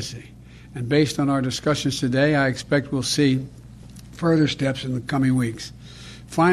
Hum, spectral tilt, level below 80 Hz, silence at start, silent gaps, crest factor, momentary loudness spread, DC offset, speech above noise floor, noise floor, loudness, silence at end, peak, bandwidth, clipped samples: none; -5.5 dB/octave; -48 dBFS; 0 s; none; 16 dB; 20 LU; under 0.1%; 20 dB; -42 dBFS; -22 LUFS; 0 s; -6 dBFS; 13.5 kHz; under 0.1%